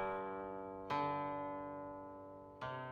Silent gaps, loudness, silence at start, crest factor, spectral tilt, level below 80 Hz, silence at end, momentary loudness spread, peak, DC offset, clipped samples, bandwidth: none; -44 LUFS; 0 s; 16 dB; -7 dB/octave; -70 dBFS; 0 s; 12 LU; -28 dBFS; under 0.1%; under 0.1%; 8.2 kHz